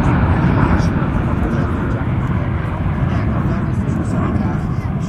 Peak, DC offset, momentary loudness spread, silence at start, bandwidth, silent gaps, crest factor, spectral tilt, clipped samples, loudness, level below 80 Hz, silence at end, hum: -2 dBFS; under 0.1%; 5 LU; 0 s; 9.6 kHz; none; 14 dB; -8.5 dB/octave; under 0.1%; -18 LUFS; -24 dBFS; 0 s; none